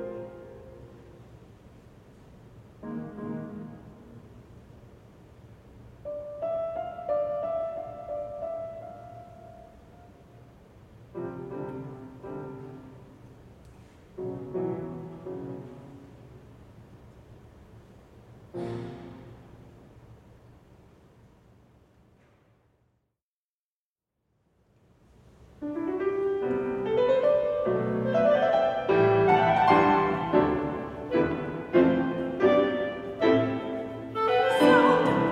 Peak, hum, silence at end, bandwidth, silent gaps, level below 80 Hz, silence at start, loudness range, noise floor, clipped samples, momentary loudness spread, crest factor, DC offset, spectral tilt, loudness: -8 dBFS; none; 0 s; 13.5 kHz; 23.22-23.96 s; -58 dBFS; 0 s; 20 LU; under -90 dBFS; under 0.1%; 25 LU; 22 dB; under 0.1%; -7 dB/octave; -26 LUFS